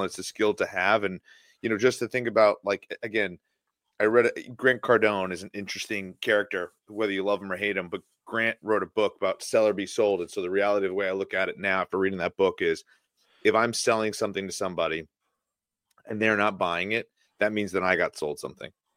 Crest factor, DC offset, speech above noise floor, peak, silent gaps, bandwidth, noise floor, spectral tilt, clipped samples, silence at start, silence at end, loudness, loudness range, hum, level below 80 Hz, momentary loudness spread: 22 dB; under 0.1%; 60 dB; -6 dBFS; none; 16 kHz; -87 dBFS; -4 dB/octave; under 0.1%; 0 s; 0.25 s; -26 LUFS; 3 LU; none; -68 dBFS; 11 LU